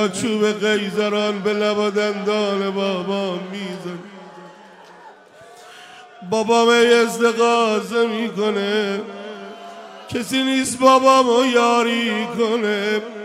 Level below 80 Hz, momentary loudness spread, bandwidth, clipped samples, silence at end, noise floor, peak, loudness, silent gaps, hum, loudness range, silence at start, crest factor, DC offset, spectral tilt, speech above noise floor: -68 dBFS; 19 LU; 15.5 kHz; under 0.1%; 0 s; -44 dBFS; 0 dBFS; -18 LUFS; none; none; 10 LU; 0 s; 18 dB; under 0.1%; -4 dB/octave; 26 dB